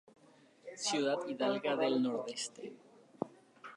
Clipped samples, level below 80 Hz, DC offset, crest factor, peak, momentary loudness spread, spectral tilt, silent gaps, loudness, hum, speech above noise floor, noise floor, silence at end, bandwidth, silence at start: under 0.1%; -90 dBFS; under 0.1%; 20 dB; -18 dBFS; 18 LU; -3.5 dB/octave; none; -36 LUFS; none; 28 dB; -63 dBFS; 0 s; 11.5 kHz; 0.65 s